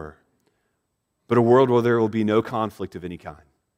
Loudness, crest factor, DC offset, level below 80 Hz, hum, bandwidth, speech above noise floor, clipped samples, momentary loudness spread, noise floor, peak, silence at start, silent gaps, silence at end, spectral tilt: -20 LUFS; 18 dB; under 0.1%; -58 dBFS; none; 9.4 kHz; 55 dB; under 0.1%; 21 LU; -75 dBFS; -4 dBFS; 0 s; none; 0.45 s; -8 dB/octave